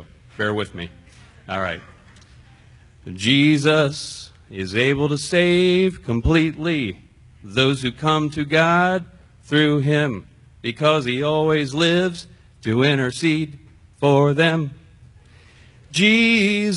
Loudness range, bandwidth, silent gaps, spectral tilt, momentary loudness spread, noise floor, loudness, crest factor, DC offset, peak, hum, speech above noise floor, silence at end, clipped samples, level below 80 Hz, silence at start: 3 LU; 11 kHz; none; -5.5 dB/octave; 15 LU; -49 dBFS; -19 LUFS; 18 dB; under 0.1%; -2 dBFS; none; 30 dB; 0 s; under 0.1%; -42 dBFS; 0 s